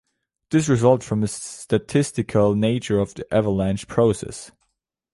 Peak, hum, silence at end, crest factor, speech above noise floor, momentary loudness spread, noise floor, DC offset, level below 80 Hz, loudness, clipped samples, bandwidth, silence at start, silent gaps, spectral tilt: -4 dBFS; none; 0.65 s; 18 dB; 55 dB; 9 LU; -75 dBFS; under 0.1%; -48 dBFS; -21 LUFS; under 0.1%; 11.5 kHz; 0.5 s; none; -6.5 dB/octave